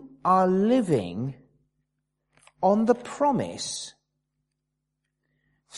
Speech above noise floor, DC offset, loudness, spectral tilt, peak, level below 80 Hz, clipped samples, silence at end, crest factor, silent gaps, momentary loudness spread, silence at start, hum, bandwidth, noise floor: 57 dB; under 0.1%; -24 LUFS; -6 dB/octave; -8 dBFS; -66 dBFS; under 0.1%; 0 s; 20 dB; none; 13 LU; 0 s; none; 11.5 kHz; -81 dBFS